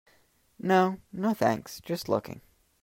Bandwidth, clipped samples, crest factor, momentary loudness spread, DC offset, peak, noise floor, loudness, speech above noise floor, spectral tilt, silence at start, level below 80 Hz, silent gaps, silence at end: 16 kHz; under 0.1%; 20 dB; 12 LU; under 0.1%; -10 dBFS; -65 dBFS; -28 LUFS; 37 dB; -6 dB/octave; 0.6 s; -66 dBFS; none; 0.45 s